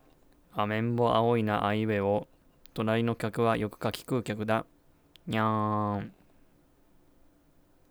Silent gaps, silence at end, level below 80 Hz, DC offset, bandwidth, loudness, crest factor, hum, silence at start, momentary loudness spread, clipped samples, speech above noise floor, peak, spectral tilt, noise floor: none; 1.8 s; -60 dBFS; under 0.1%; over 20 kHz; -29 LUFS; 20 dB; none; 0.55 s; 10 LU; under 0.1%; 34 dB; -12 dBFS; -7 dB/octave; -63 dBFS